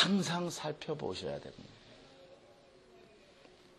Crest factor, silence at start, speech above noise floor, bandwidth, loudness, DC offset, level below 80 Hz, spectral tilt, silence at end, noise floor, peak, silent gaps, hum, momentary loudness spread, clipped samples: 24 dB; 0 s; 24 dB; 12 kHz; -36 LUFS; under 0.1%; -70 dBFS; -4.5 dB/octave; 0.75 s; -61 dBFS; -14 dBFS; none; none; 25 LU; under 0.1%